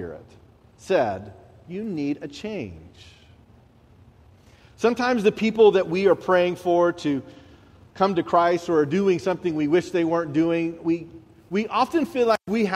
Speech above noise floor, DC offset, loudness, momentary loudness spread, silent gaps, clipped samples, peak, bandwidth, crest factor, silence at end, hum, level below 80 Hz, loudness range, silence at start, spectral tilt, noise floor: 31 dB; under 0.1%; -22 LUFS; 13 LU; none; under 0.1%; -4 dBFS; 13 kHz; 18 dB; 0 s; none; -58 dBFS; 10 LU; 0 s; -6.5 dB/octave; -53 dBFS